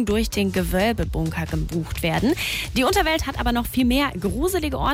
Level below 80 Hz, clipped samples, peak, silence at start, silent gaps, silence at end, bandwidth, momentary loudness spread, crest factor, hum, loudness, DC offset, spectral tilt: -32 dBFS; under 0.1%; -10 dBFS; 0 s; none; 0 s; 16 kHz; 6 LU; 12 dB; none; -22 LUFS; under 0.1%; -5 dB/octave